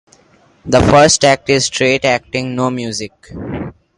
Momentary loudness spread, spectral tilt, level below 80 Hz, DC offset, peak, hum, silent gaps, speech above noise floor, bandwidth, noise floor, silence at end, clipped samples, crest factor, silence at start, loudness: 18 LU; -4 dB/octave; -36 dBFS; under 0.1%; 0 dBFS; none; none; 37 dB; 11.5 kHz; -50 dBFS; 0.25 s; under 0.1%; 14 dB; 0.65 s; -13 LUFS